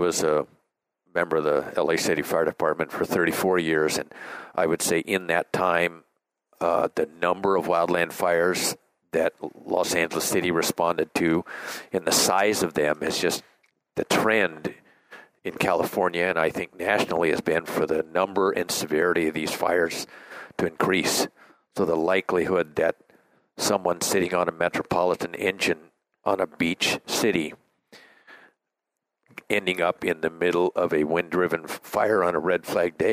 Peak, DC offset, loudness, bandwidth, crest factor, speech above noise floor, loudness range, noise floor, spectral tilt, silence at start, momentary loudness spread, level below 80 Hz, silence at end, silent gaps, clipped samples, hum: -4 dBFS; under 0.1%; -24 LUFS; 16 kHz; 20 dB; 60 dB; 3 LU; -84 dBFS; -3.5 dB/octave; 0 s; 7 LU; -62 dBFS; 0 s; none; under 0.1%; none